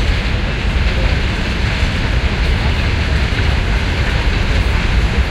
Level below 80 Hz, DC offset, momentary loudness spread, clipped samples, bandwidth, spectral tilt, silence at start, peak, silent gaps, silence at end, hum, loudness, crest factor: -16 dBFS; under 0.1%; 2 LU; under 0.1%; 11.5 kHz; -5.5 dB/octave; 0 s; -2 dBFS; none; 0 s; none; -17 LUFS; 12 dB